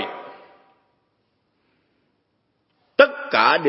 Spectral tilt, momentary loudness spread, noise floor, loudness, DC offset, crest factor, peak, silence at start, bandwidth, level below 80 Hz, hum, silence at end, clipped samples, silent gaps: -7 dB/octave; 22 LU; -70 dBFS; -18 LUFS; under 0.1%; 24 dB; 0 dBFS; 0 s; 5.8 kHz; -76 dBFS; none; 0 s; under 0.1%; none